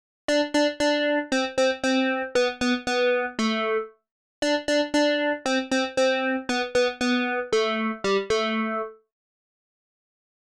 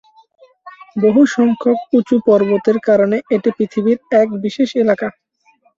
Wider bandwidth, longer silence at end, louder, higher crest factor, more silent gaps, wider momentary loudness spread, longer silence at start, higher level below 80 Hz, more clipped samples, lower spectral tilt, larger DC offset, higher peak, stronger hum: first, 12.5 kHz vs 7.6 kHz; first, 1.5 s vs 0.65 s; second, -24 LUFS vs -15 LUFS; about the same, 14 dB vs 14 dB; first, 4.11-4.42 s vs none; about the same, 4 LU vs 6 LU; second, 0.3 s vs 0.65 s; about the same, -58 dBFS vs -60 dBFS; neither; second, -3 dB/octave vs -7 dB/octave; neither; second, -10 dBFS vs -2 dBFS; neither